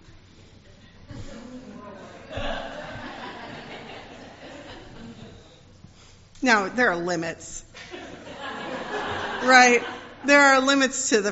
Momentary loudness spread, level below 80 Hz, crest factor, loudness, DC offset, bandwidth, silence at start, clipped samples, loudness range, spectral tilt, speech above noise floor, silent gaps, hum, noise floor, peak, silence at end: 26 LU; -48 dBFS; 24 dB; -21 LUFS; under 0.1%; 8 kHz; 1.1 s; under 0.1%; 19 LU; -1.5 dB/octave; 31 dB; none; none; -50 dBFS; -2 dBFS; 0 s